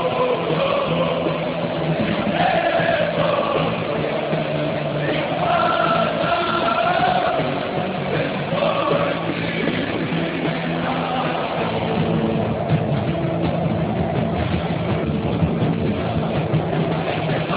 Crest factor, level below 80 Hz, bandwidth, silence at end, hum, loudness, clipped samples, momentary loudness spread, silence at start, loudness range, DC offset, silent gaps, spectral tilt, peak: 14 dB; -42 dBFS; 4 kHz; 0 s; none; -21 LUFS; under 0.1%; 4 LU; 0 s; 2 LU; under 0.1%; none; -10.5 dB/octave; -6 dBFS